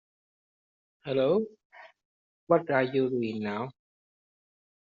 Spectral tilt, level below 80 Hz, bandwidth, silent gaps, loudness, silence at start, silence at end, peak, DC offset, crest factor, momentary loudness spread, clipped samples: -5.5 dB/octave; -74 dBFS; 6.8 kHz; 1.65-1.70 s, 2.05-2.47 s; -28 LUFS; 1.05 s; 1.15 s; -10 dBFS; under 0.1%; 22 dB; 14 LU; under 0.1%